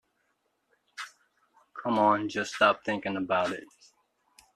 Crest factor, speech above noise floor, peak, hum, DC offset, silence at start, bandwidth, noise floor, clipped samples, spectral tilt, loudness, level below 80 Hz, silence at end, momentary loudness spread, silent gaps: 22 dB; 48 dB; -8 dBFS; none; under 0.1%; 1 s; 12.5 kHz; -76 dBFS; under 0.1%; -4.5 dB/octave; -27 LUFS; -74 dBFS; 0.9 s; 19 LU; none